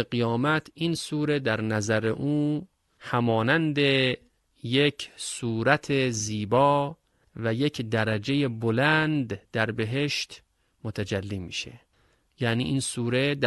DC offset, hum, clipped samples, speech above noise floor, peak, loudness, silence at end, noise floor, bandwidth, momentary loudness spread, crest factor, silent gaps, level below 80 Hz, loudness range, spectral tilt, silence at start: under 0.1%; none; under 0.1%; 41 dB; -6 dBFS; -26 LUFS; 0 s; -66 dBFS; 12.5 kHz; 11 LU; 22 dB; none; -56 dBFS; 5 LU; -5 dB/octave; 0 s